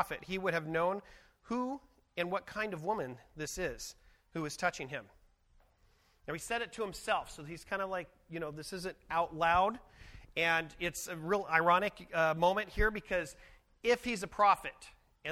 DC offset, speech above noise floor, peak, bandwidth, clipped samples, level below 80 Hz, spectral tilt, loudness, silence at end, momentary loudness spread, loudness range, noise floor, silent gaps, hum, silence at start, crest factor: under 0.1%; 34 dB; -12 dBFS; 16 kHz; under 0.1%; -52 dBFS; -4 dB/octave; -34 LUFS; 0 s; 16 LU; 9 LU; -69 dBFS; none; none; 0 s; 24 dB